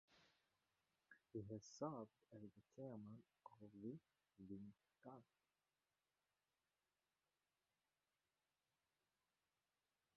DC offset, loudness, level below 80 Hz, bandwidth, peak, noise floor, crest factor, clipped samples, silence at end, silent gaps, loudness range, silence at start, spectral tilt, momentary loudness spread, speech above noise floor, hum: under 0.1%; -58 LUFS; -88 dBFS; 6.2 kHz; -36 dBFS; under -90 dBFS; 26 dB; under 0.1%; 4.95 s; none; 9 LU; 0.1 s; -7.5 dB/octave; 14 LU; over 33 dB; none